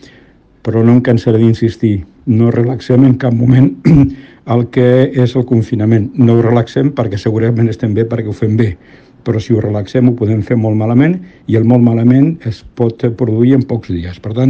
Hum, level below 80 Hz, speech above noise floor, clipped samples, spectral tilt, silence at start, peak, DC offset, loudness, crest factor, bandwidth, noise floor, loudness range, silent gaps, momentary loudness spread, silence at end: none; -40 dBFS; 34 dB; 1%; -9.5 dB/octave; 0.65 s; 0 dBFS; under 0.1%; -12 LUFS; 10 dB; 7 kHz; -44 dBFS; 4 LU; none; 9 LU; 0 s